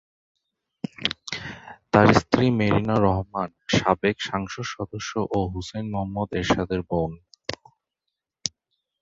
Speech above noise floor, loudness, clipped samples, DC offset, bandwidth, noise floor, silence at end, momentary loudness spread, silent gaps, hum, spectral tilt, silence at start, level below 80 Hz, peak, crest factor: 61 dB; -24 LUFS; under 0.1%; under 0.1%; 7.8 kHz; -84 dBFS; 0.55 s; 16 LU; none; none; -5.5 dB/octave; 1 s; -46 dBFS; -2 dBFS; 24 dB